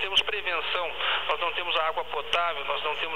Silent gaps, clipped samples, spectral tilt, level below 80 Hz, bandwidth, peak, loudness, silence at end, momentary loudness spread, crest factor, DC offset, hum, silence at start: none; under 0.1%; -1.5 dB/octave; -58 dBFS; 16 kHz; -10 dBFS; -27 LUFS; 0 s; 4 LU; 20 dB; 1%; 60 Hz at -55 dBFS; 0 s